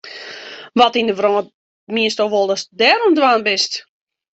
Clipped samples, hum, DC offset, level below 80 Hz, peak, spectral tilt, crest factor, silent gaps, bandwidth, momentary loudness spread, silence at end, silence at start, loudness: under 0.1%; none; under 0.1%; -64 dBFS; 0 dBFS; -3 dB/octave; 16 dB; 1.54-1.87 s; 8.2 kHz; 18 LU; 0.5 s; 0.05 s; -16 LUFS